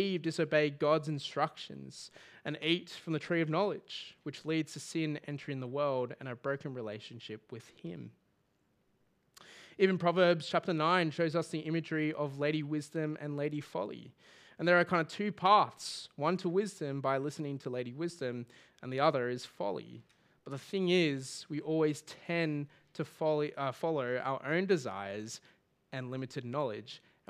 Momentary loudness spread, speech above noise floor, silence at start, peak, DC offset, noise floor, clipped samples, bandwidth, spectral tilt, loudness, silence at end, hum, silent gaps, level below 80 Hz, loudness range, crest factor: 17 LU; 41 dB; 0 s; -14 dBFS; under 0.1%; -75 dBFS; under 0.1%; 14.5 kHz; -5.5 dB/octave; -34 LUFS; 0.3 s; none; none; -84 dBFS; 7 LU; 22 dB